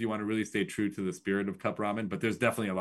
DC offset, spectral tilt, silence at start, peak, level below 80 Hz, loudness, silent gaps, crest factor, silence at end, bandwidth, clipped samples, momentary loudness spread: under 0.1%; -5.5 dB/octave; 0 s; -12 dBFS; -70 dBFS; -32 LUFS; none; 20 dB; 0 s; 12.5 kHz; under 0.1%; 4 LU